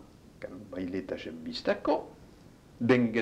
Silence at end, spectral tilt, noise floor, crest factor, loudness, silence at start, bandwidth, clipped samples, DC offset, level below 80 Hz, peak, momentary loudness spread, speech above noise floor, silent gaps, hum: 0 s; -7 dB/octave; -54 dBFS; 22 dB; -31 LUFS; 0 s; 9.6 kHz; under 0.1%; under 0.1%; -60 dBFS; -10 dBFS; 19 LU; 25 dB; none; none